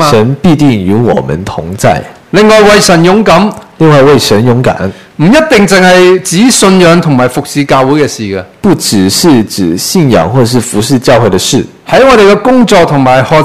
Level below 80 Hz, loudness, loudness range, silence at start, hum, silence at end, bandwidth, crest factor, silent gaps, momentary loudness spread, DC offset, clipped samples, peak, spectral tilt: -34 dBFS; -6 LUFS; 3 LU; 0 s; none; 0 s; 16 kHz; 6 dB; none; 9 LU; 2%; 8%; 0 dBFS; -5 dB/octave